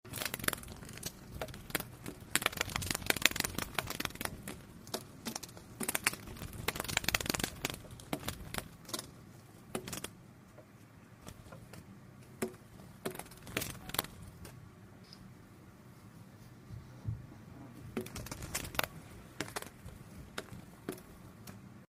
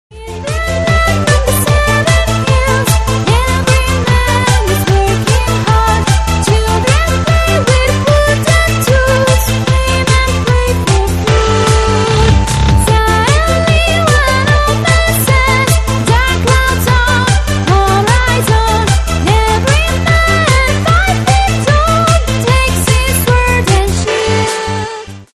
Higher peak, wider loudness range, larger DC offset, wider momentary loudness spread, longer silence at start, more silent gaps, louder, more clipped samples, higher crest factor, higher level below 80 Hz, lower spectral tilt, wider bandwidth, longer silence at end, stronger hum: about the same, -2 dBFS vs 0 dBFS; first, 13 LU vs 1 LU; neither; first, 22 LU vs 3 LU; about the same, 0.05 s vs 0.1 s; neither; second, -38 LUFS vs -10 LUFS; neither; first, 38 dB vs 10 dB; second, -58 dBFS vs -16 dBFS; second, -2.5 dB/octave vs -4.5 dB/octave; first, 16 kHz vs 13.5 kHz; about the same, 0.1 s vs 0.1 s; neither